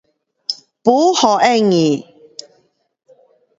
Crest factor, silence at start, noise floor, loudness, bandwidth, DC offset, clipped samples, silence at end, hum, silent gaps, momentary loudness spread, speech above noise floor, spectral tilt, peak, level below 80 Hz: 18 dB; 0.5 s; -60 dBFS; -15 LUFS; 7.8 kHz; under 0.1%; under 0.1%; 1.6 s; none; none; 23 LU; 48 dB; -4.5 dB/octave; 0 dBFS; -62 dBFS